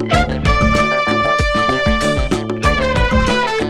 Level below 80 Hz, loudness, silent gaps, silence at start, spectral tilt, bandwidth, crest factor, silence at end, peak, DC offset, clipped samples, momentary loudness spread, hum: -22 dBFS; -15 LUFS; none; 0 s; -5 dB/octave; 12 kHz; 14 dB; 0 s; -2 dBFS; under 0.1%; under 0.1%; 3 LU; none